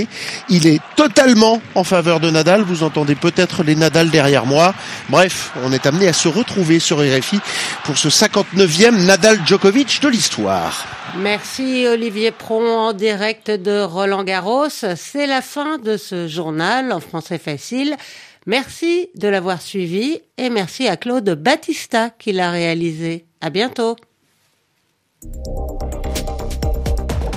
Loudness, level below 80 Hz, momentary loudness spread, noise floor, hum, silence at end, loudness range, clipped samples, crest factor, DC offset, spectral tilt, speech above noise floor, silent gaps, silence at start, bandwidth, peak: -16 LUFS; -34 dBFS; 12 LU; -65 dBFS; none; 0 s; 9 LU; under 0.1%; 16 dB; under 0.1%; -4 dB/octave; 49 dB; none; 0 s; 15.5 kHz; 0 dBFS